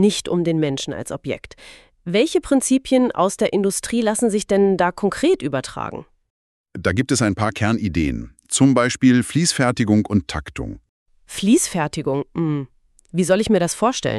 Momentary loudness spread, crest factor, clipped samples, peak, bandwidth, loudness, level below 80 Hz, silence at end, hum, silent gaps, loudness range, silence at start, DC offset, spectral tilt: 13 LU; 16 dB; under 0.1%; -4 dBFS; 13.5 kHz; -19 LUFS; -44 dBFS; 0 s; none; 6.30-6.64 s, 10.89-11.06 s; 3 LU; 0 s; under 0.1%; -5 dB/octave